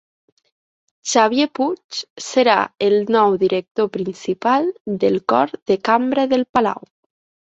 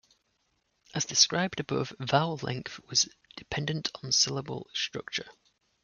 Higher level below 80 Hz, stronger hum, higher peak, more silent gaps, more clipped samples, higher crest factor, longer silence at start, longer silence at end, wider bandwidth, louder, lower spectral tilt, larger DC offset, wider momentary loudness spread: about the same, -60 dBFS vs -64 dBFS; neither; first, -2 dBFS vs -8 dBFS; first, 1.84-1.89 s, 2.10-2.16 s, 3.71-3.75 s, 4.80-4.85 s, 5.62-5.66 s, 6.49-6.54 s vs none; neither; second, 18 dB vs 24 dB; about the same, 1.05 s vs 0.95 s; first, 0.7 s vs 0.55 s; second, 8.2 kHz vs 11 kHz; first, -18 LUFS vs -29 LUFS; first, -4 dB/octave vs -2.5 dB/octave; neither; second, 9 LU vs 13 LU